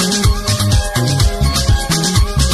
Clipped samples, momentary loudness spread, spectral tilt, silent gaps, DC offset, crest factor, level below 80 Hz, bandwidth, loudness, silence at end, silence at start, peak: under 0.1%; 1 LU; -4 dB/octave; none; under 0.1%; 12 dB; -18 dBFS; 13 kHz; -14 LUFS; 0 s; 0 s; -2 dBFS